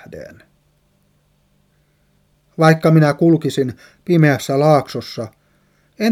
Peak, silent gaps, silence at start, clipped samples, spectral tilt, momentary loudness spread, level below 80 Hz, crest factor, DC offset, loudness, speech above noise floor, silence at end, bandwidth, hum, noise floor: 0 dBFS; none; 0.1 s; under 0.1%; -7 dB/octave; 21 LU; -60 dBFS; 18 dB; under 0.1%; -15 LUFS; 45 dB; 0 s; 14.5 kHz; 50 Hz at -35 dBFS; -60 dBFS